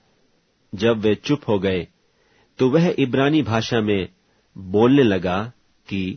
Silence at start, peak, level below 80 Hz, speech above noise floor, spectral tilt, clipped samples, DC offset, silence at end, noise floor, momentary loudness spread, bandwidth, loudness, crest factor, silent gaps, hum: 0.75 s; -4 dBFS; -54 dBFS; 44 dB; -7 dB/octave; under 0.1%; under 0.1%; 0 s; -63 dBFS; 15 LU; 6.6 kHz; -20 LUFS; 18 dB; none; none